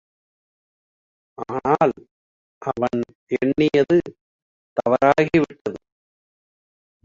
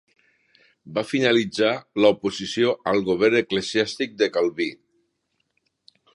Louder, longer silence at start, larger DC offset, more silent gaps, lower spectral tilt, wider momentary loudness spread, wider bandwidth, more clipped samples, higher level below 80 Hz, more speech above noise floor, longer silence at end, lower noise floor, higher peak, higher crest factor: about the same, -20 LUFS vs -22 LUFS; first, 1.4 s vs 0.85 s; neither; first, 2.11-2.61 s, 3.15-3.27 s, 4.21-4.76 s, 5.61-5.65 s vs none; first, -7.5 dB/octave vs -4.5 dB/octave; first, 15 LU vs 7 LU; second, 7.6 kHz vs 11.5 kHz; neither; first, -56 dBFS vs -62 dBFS; first, over 70 dB vs 52 dB; about the same, 1.3 s vs 1.4 s; first, under -90 dBFS vs -74 dBFS; about the same, -4 dBFS vs -4 dBFS; about the same, 20 dB vs 20 dB